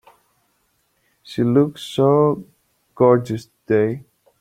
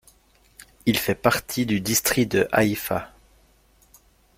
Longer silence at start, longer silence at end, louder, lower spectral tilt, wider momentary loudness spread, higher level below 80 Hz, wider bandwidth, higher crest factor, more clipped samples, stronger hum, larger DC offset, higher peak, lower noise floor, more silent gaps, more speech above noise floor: first, 1.25 s vs 0.85 s; second, 0.4 s vs 1.3 s; first, -19 LUFS vs -22 LUFS; first, -8 dB/octave vs -4 dB/octave; first, 14 LU vs 8 LU; second, -60 dBFS vs -52 dBFS; second, 14 kHz vs 16.5 kHz; second, 18 dB vs 24 dB; neither; neither; neither; about the same, -2 dBFS vs -2 dBFS; first, -66 dBFS vs -58 dBFS; neither; first, 49 dB vs 36 dB